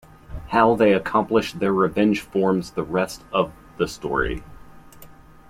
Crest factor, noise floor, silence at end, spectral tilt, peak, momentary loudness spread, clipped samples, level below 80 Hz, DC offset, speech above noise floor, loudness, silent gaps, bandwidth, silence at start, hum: 18 dB; -45 dBFS; 0.45 s; -6 dB/octave; -4 dBFS; 10 LU; under 0.1%; -44 dBFS; under 0.1%; 24 dB; -22 LUFS; none; 16 kHz; 0.3 s; none